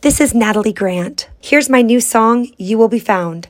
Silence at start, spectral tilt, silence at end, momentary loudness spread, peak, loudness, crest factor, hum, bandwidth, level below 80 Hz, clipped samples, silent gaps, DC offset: 0.05 s; -4 dB/octave; 0.1 s; 8 LU; 0 dBFS; -13 LUFS; 14 dB; none; 16.5 kHz; -38 dBFS; under 0.1%; none; under 0.1%